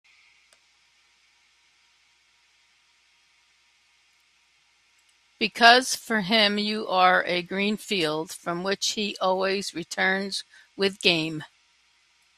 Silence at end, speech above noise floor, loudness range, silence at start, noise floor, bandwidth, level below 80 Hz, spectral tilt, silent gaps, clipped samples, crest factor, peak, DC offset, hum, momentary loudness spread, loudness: 0.9 s; 40 dB; 5 LU; 5.4 s; -64 dBFS; 14.5 kHz; -70 dBFS; -3 dB/octave; none; under 0.1%; 26 dB; 0 dBFS; under 0.1%; none; 13 LU; -23 LUFS